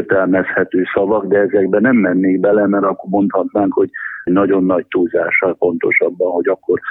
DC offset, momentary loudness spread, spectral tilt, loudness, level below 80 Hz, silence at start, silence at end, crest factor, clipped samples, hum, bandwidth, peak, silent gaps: under 0.1%; 4 LU; -11 dB/octave; -15 LUFS; -56 dBFS; 0 s; 0 s; 14 dB; under 0.1%; none; 3.9 kHz; -2 dBFS; none